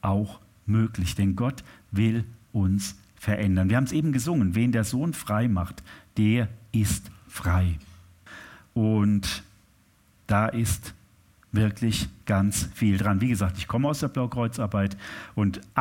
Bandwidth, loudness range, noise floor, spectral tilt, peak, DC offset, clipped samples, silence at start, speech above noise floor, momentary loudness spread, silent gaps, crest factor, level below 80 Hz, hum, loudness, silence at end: 17 kHz; 3 LU; -61 dBFS; -6 dB/octave; -6 dBFS; under 0.1%; under 0.1%; 0.05 s; 36 dB; 11 LU; none; 18 dB; -44 dBFS; none; -26 LUFS; 0 s